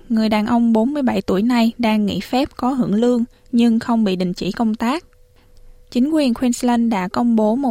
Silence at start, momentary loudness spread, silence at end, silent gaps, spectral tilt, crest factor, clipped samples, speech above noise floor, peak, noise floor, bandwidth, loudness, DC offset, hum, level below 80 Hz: 0.1 s; 5 LU; 0 s; none; -6 dB/octave; 14 dB; under 0.1%; 31 dB; -4 dBFS; -48 dBFS; 14.5 kHz; -18 LUFS; under 0.1%; none; -48 dBFS